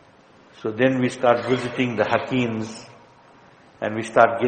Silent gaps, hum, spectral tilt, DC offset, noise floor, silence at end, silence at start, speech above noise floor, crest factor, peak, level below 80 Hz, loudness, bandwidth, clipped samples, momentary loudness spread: none; none; -6 dB/octave; under 0.1%; -52 dBFS; 0 s; 0.6 s; 31 dB; 22 dB; 0 dBFS; -62 dBFS; -22 LUFS; 8.8 kHz; under 0.1%; 12 LU